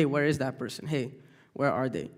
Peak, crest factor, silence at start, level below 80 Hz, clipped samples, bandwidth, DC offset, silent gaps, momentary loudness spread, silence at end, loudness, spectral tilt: -12 dBFS; 18 dB; 0 s; -64 dBFS; under 0.1%; 16 kHz; under 0.1%; none; 11 LU; 0.05 s; -30 LUFS; -6.5 dB/octave